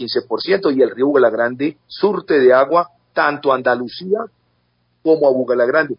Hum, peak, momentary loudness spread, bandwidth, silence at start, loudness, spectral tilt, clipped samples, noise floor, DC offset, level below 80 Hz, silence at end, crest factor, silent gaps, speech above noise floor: none; 0 dBFS; 9 LU; 5.4 kHz; 0 s; -16 LUFS; -10 dB/octave; under 0.1%; -63 dBFS; under 0.1%; -64 dBFS; 0.05 s; 16 dB; none; 48 dB